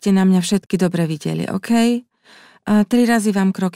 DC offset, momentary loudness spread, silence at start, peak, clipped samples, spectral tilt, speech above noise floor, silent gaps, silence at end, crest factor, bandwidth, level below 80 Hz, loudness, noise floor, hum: under 0.1%; 8 LU; 0.05 s; -4 dBFS; under 0.1%; -6 dB/octave; 32 dB; none; 0.05 s; 14 dB; 15 kHz; -58 dBFS; -17 LUFS; -48 dBFS; none